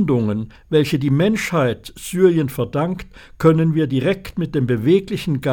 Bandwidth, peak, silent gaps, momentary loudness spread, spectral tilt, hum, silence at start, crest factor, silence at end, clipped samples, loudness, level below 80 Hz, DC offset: 18 kHz; 0 dBFS; none; 8 LU; -7 dB/octave; none; 0 s; 18 dB; 0 s; under 0.1%; -19 LUFS; -44 dBFS; under 0.1%